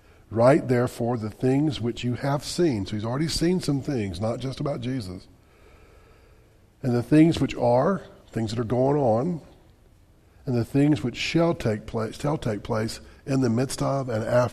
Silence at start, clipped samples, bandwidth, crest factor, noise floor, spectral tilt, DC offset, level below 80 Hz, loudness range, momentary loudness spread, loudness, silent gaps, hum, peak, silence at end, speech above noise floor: 0.3 s; under 0.1%; 14 kHz; 18 dB; -56 dBFS; -6.5 dB/octave; under 0.1%; -48 dBFS; 5 LU; 10 LU; -25 LUFS; none; none; -6 dBFS; 0 s; 32 dB